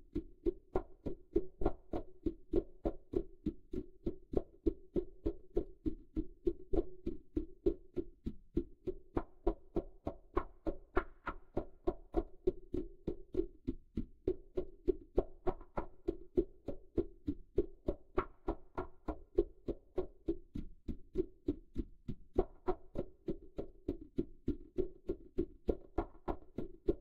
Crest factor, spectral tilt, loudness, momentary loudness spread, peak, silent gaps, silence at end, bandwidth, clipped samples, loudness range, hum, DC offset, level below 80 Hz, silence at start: 24 dB; -10 dB/octave; -42 LUFS; 8 LU; -14 dBFS; none; 0 s; 4.9 kHz; under 0.1%; 2 LU; none; under 0.1%; -46 dBFS; 0 s